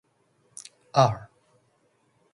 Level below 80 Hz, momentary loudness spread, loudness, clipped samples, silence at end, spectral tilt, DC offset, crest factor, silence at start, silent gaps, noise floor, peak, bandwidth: -62 dBFS; 22 LU; -24 LUFS; under 0.1%; 1.1 s; -5.5 dB/octave; under 0.1%; 24 dB; 0.95 s; none; -68 dBFS; -6 dBFS; 11.5 kHz